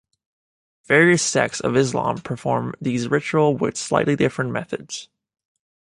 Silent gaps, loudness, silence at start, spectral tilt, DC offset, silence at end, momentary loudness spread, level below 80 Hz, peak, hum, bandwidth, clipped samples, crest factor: none; -20 LUFS; 0.9 s; -4.5 dB/octave; under 0.1%; 0.95 s; 12 LU; -58 dBFS; -2 dBFS; none; 11.5 kHz; under 0.1%; 20 dB